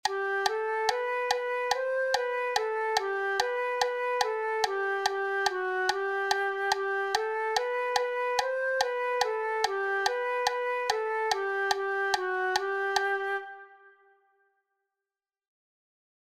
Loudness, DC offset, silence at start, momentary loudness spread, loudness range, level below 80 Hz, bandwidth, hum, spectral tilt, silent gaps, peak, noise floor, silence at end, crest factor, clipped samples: -29 LUFS; under 0.1%; 0.05 s; 1 LU; 3 LU; -70 dBFS; 16 kHz; none; -0.5 dB/octave; none; -10 dBFS; under -90 dBFS; 2.5 s; 20 dB; under 0.1%